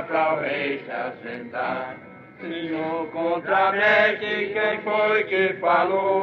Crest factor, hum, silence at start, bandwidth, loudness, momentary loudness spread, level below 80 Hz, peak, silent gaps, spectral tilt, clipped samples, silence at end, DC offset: 18 dB; none; 0 s; 6.6 kHz; -22 LUFS; 13 LU; -72 dBFS; -6 dBFS; none; -6.5 dB/octave; under 0.1%; 0 s; under 0.1%